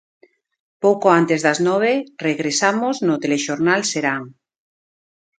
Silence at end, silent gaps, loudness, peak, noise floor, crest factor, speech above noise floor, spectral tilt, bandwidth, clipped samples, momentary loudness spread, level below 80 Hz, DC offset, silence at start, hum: 1.1 s; none; -18 LUFS; 0 dBFS; under -90 dBFS; 20 dB; over 72 dB; -4 dB/octave; 9.4 kHz; under 0.1%; 7 LU; -68 dBFS; under 0.1%; 0.8 s; none